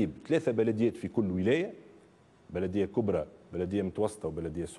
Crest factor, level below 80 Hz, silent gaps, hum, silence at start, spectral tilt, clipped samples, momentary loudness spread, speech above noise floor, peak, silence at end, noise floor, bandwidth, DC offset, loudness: 16 dB; -62 dBFS; none; none; 0 s; -7.5 dB/octave; under 0.1%; 9 LU; 29 dB; -16 dBFS; 0 s; -60 dBFS; 12 kHz; under 0.1%; -31 LUFS